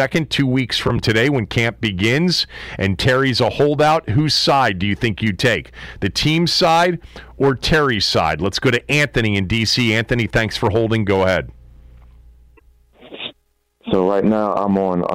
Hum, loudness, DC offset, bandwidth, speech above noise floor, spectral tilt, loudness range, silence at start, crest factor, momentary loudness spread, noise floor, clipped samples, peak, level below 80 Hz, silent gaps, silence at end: none; -17 LUFS; under 0.1%; 16 kHz; 45 dB; -5 dB/octave; 6 LU; 0 s; 12 dB; 7 LU; -62 dBFS; under 0.1%; -6 dBFS; -38 dBFS; none; 0 s